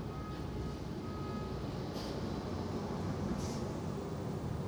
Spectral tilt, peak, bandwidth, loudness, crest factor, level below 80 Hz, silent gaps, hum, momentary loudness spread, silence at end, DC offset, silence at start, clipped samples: -6.5 dB/octave; -24 dBFS; over 20 kHz; -40 LUFS; 14 dB; -50 dBFS; none; none; 4 LU; 0 s; under 0.1%; 0 s; under 0.1%